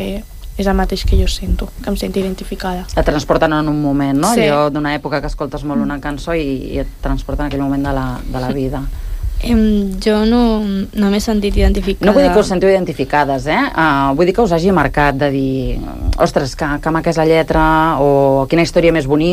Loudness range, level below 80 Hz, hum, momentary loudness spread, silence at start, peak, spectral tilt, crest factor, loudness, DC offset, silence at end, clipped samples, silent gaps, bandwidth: 6 LU; -24 dBFS; none; 10 LU; 0 s; 0 dBFS; -6 dB/octave; 14 dB; -15 LUFS; under 0.1%; 0 s; under 0.1%; none; 15.5 kHz